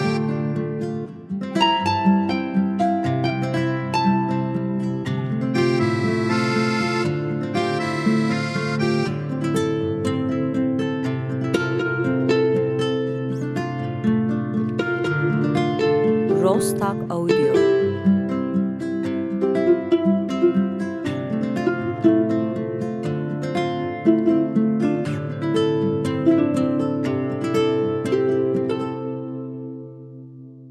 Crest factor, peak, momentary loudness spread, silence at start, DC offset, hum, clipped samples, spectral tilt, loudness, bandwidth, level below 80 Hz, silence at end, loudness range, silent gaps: 16 dB; -4 dBFS; 7 LU; 0 s; under 0.1%; none; under 0.1%; -7 dB/octave; -21 LUFS; 13 kHz; -62 dBFS; 0 s; 3 LU; none